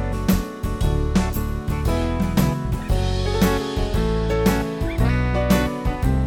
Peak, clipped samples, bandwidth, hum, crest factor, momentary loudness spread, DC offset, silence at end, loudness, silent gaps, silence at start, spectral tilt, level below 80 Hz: -4 dBFS; under 0.1%; 19.5 kHz; none; 16 dB; 5 LU; under 0.1%; 0 s; -22 LUFS; none; 0 s; -6.5 dB/octave; -24 dBFS